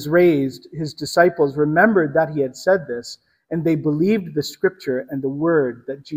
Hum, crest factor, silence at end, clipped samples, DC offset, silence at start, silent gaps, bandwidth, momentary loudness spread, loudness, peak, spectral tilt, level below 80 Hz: none; 18 dB; 0 s; under 0.1%; under 0.1%; 0 s; none; 16 kHz; 13 LU; -19 LUFS; 0 dBFS; -6.5 dB/octave; -60 dBFS